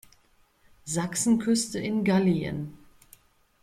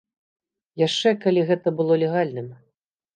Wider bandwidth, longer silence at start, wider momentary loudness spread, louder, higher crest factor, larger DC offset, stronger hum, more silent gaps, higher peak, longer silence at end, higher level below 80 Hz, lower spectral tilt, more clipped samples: first, 16 kHz vs 9.4 kHz; about the same, 0.85 s vs 0.75 s; about the same, 13 LU vs 15 LU; second, -26 LUFS vs -21 LUFS; about the same, 16 dB vs 16 dB; neither; neither; neither; second, -12 dBFS vs -6 dBFS; first, 0.85 s vs 0.6 s; first, -58 dBFS vs -74 dBFS; about the same, -5 dB/octave vs -6 dB/octave; neither